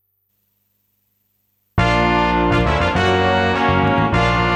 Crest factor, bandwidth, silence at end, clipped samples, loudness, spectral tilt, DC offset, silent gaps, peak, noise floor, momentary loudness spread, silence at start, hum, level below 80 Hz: 14 dB; 15 kHz; 0 s; under 0.1%; -16 LUFS; -6.5 dB/octave; under 0.1%; none; -4 dBFS; -67 dBFS; 2 LU; 1.75 s; 50 Hz at -45 dBFS; -30 dBFS